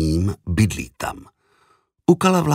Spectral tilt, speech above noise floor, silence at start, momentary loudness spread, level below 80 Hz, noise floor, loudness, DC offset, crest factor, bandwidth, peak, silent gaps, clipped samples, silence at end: -6 dB/octave; 42 dB; 0 s; 14 LU; -36 dBFS; -61 dBFS; -21 LUFS; under 0.1%; 18 dB; 16 kHz; -2 dBFS; none; under 0.1%; 0 s